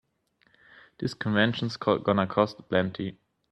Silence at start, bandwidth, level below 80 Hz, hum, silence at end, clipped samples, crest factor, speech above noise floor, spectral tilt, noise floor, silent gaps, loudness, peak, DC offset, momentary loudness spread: 1 s; 8.8 kHz; -64 dBFS; none; 0.4 s; under 0.1%; 22 dB; 42 dB; -6.5 dB/octave; -69 dBFS; none; -27 LUFS; -6 dBFS; under 0.1%; 10 LU